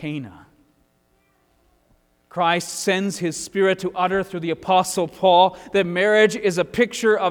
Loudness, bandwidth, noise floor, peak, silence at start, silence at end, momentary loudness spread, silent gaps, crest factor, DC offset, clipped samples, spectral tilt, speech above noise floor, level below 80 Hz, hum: -20 LUFS; 18.5 kHz; -63 dBFS; -4 dBFS; 0 s; 0 s; 10 LU; none; 18 dB; under 0.1%; under 0.1%; -4 dB/octave; 44 dB; -58 dBFS; none